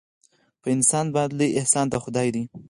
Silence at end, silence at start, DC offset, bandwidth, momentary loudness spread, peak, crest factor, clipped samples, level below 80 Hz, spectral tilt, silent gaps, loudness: 0.1 s; 0.65 s; under 0.1%; 11.5 kHz; 7 LU; -4 dBFS; 20 dB; under 0.1%; -58 dBFS; -4.5 dB/octave; none; -22 LUFS